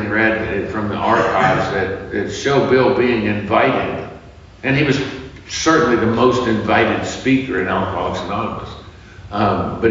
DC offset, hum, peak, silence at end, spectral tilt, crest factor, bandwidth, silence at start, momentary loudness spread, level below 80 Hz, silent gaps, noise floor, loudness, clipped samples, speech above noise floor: under 0.1%; none; -2 dBFS; 0 s; -4.5 dB/octave; 16 dB; 7.6 kHz; 0 s; 11 LU; -42 dBFS; none; -39 dBFS; -17 LUFS; under 0.1%; 22 dB